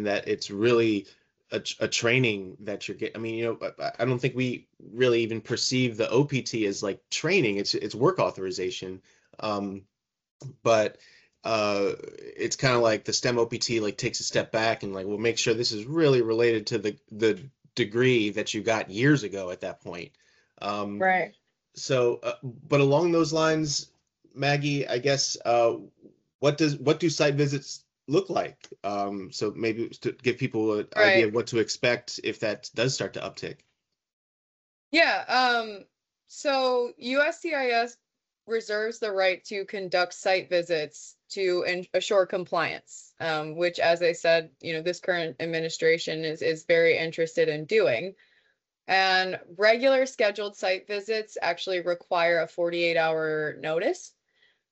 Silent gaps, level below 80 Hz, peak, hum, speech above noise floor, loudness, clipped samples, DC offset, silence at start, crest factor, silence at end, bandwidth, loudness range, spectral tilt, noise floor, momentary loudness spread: 10.31-10.39 s, 26.35-26.39 s, 34.13-34.91 s; -68 dBFS; -6 dBFS; none; 44 dB; -26 LUFS; under 0.1%; under 0.1%; 0 s; 20 dB; 0.65 s; 8.2 kHz; 4 LU; -4.5 dB/octave; -70 dBFS; 12 LU